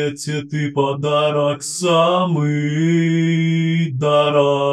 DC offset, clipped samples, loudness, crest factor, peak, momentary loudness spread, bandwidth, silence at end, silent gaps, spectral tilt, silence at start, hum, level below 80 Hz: under 0.1%; under 0.1%; -17 LUFS; 14 dB; -2 dBFS; 7 LU; 12.5 kHz; 0 s; none; -6 dB/octave; 0 s; none; -64 dBFS